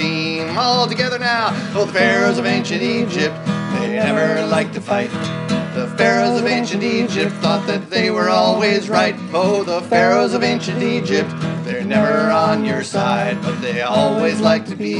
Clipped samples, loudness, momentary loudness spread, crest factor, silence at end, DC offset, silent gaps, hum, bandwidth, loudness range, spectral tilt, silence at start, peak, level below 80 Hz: under 0.1%; -17 LUFS; 6 LU; 16 dB; 0 s; under 0.1%; none; none; 11 kHz; 2 LU; -5 dB/octave; 0 s; 0 dBFS; -66 dBFS